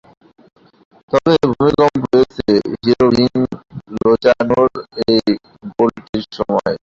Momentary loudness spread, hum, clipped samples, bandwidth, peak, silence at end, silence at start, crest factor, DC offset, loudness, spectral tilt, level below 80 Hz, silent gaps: 10 LU; none; under 0.1%; 7.6 kHz; 0 dBFS; 0.05 s; 1.1 s; 14 dB; under 0.1%; -15 LUFS; -7 dB/octave; -44 dBFS; 6.09-6.13 s